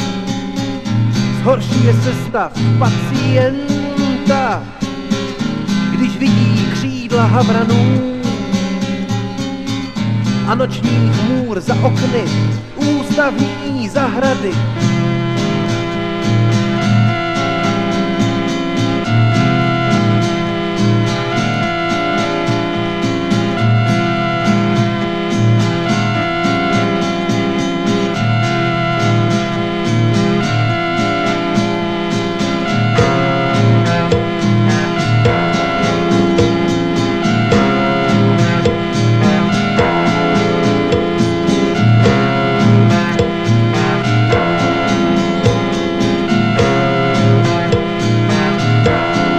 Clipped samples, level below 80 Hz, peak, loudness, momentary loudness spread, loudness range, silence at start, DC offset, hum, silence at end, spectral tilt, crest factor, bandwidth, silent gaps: under 0.1%; -36 dBFS; 0 dBFS; -14 LUFS; 5 LU; 3 LU; 0 s; under 0.1%; none; 0 s; -6.5 dB/octave; 14 dB; 9.2 kHz; none